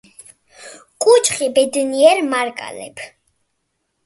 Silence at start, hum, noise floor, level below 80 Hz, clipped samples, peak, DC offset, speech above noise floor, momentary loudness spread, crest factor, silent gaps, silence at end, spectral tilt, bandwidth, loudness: 0.6 s; none; -71 dBFS; -66 dBFS; under 0.1%; 0 dBFS; under 0.1%; 56 dB; 19 LU; 18 dB; none; 1 s; -1.5 dB/octave; 12 kHz; -15 LUFS